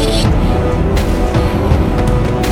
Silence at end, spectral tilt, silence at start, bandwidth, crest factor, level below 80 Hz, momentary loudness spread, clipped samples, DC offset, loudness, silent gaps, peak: 0 s; -6.5 dB/octave; 0 s; 16.5 kHz; 12 dB; -16 dBFS; 1 LU; under 0.1%; under 0.1%; -14 LUFS; none; 0 dBFS